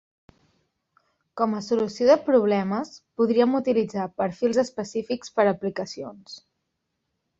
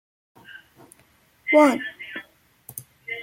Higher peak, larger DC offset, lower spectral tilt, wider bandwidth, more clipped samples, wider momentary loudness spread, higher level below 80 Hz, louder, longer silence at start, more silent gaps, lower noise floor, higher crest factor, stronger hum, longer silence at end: about the same, -6 dBFS vs -4 dBFS; neither; first, -6 dB/octave vs -4 dB/octave; second, 7.8 kHz vs 16.5 kHz; neither; second, 17 LU vs 28 LU; first, -66 dBFS vs -72 dBFS; second, -24 LUFS vs -20 LUFS; first, 1.35 s vs 0.55 s; neither; first, -78 dBFS vs -59 dBFS; about the same, 20 dB vs 20 dB; neither; first, 1 s vs 0 s